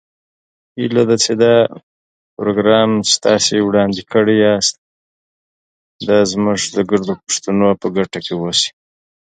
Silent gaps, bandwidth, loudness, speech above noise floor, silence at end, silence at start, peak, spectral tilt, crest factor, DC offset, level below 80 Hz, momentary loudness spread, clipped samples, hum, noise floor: 1.83-2.37 s, 4.78-5.99 s; 9.4 kHz; -15 LUFS; over 76 dB; 0.7 s; 0.75 s; 0 dBFS; -4 dB/octave; 16 dB; under 0.1%; -52 dBFS; 8 LU; under 0.1%; none; under -90 dBFS